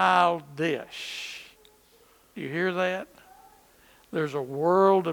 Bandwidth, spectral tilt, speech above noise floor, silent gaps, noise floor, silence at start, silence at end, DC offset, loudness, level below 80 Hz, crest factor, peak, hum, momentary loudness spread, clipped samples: 19 kHz; -5.5 dB/octave; 34 dB; none; -59 dBFS; 0 s; 0 s; under 0.1%; -27 LUFS; -70 dBFS; 20 dB; -8 dBFS; none; 18 LU; under 0.1%